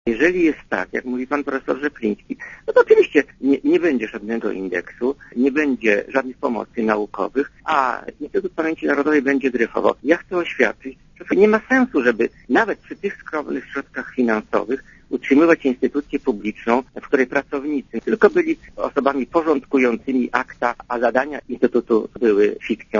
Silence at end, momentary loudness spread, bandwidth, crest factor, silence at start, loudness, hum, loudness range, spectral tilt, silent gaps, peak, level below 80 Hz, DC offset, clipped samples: 0 s; 10 LU; 7.4 kHz; 20 dB; 0.05 s; -20 LUFS; none; 3 LU; -6 dB/octave; none; 0 dBFS; -52 dBFS; under 0.1%; under 0.1%